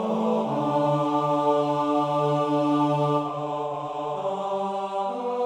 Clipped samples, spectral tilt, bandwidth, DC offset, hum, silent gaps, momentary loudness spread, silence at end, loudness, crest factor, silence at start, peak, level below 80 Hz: under 0.1%; -7.5 dB/octave; 9.8 kHz; under 0.1%; none; none; 7 LU; 0 s; -25 LUFS; 14 dB; 0 s; -10 dBFS; -74 dBFS